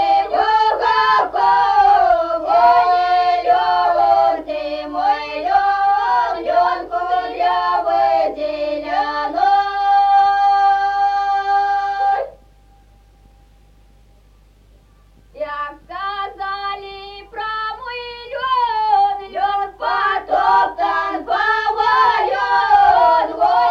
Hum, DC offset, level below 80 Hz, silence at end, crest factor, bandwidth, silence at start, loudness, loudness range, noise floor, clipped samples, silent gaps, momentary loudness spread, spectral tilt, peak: 50 Hz at -50 dBFS; under 0.1%; -48 dBFS; 0 s; 14 dB; 7.2 kHz; 0 s; -16 LUFS; 13 LU; -49 dBFS; under 0.1%; none; 12 LU; -3.5 dB/octave; -2 dBFS